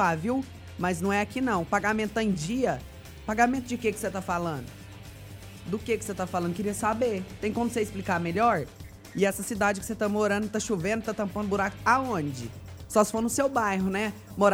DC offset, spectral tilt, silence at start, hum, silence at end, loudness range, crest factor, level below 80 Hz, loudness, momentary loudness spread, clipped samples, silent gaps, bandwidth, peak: under 0.1%; -5 dB/octave; 0 s; none; 0 s; 4 LU; 20 dB; -52 dBFS; -28 LUFS; 15 LU; under 0.1%; none; 19 kHz; -8 dBFS